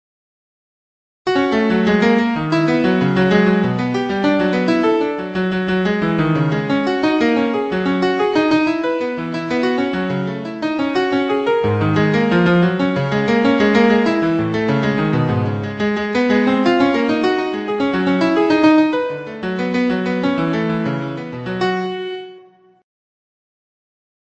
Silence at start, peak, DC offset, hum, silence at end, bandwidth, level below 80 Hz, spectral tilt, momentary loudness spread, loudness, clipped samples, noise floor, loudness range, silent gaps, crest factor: 1.25 s; -2 dBFS; under 0.1%; none; 1.95 s; 8.4 kHz; -50 dBFS; -7 dB/octave; 8 LU; -17 LUFS; under 0.1%; -46 dBFS; 5 LU; none; 16 dB